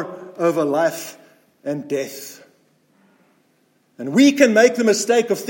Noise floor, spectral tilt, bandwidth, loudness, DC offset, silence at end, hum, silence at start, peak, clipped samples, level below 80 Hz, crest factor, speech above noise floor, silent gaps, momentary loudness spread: -62 dBFS; -4 dB/octave; 17 kHz; -17 LUFS; under 0.1%; 0 s; none; 0 s; 0 dBFS; under 0.1%; -74 dBFS; 18 dB; 44 dB; none; 20 LU